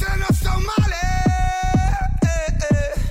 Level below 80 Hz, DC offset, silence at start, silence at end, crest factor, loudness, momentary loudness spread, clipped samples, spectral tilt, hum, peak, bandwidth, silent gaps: -22 dBFS; under 0.1%; 0 s; 0 s; 10 dB; -20 LUFS; 1 LU; under 0.1%; -6 dB/octave; none; -8 dBFS; 16 kHz; none